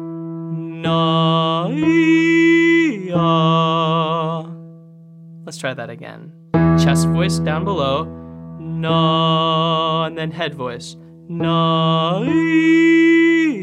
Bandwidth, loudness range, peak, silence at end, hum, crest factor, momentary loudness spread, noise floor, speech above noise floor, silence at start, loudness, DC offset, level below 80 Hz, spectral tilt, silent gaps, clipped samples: 11.5 kHz; 5 LU; -2 dBFS; 0 s; none; 14 dB; 18 LU; -41 dBFS; 25 dB; 0 s; -16 LUFS; under 0.1%; -50 dBFS; -6 dB/octave; none; under 0.1%